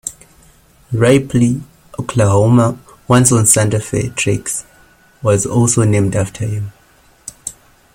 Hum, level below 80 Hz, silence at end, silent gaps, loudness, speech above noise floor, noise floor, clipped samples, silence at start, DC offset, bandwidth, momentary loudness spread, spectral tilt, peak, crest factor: none; -42 dBFS; 0.45 s; none; -14 LUFS; 37 dB; -50 dBFS; under 0.1%; 0.05 s; under 0.1%; 16.5 kHz; 18 LU; -5.5 dB/octave; 0 dBFS; 16 dB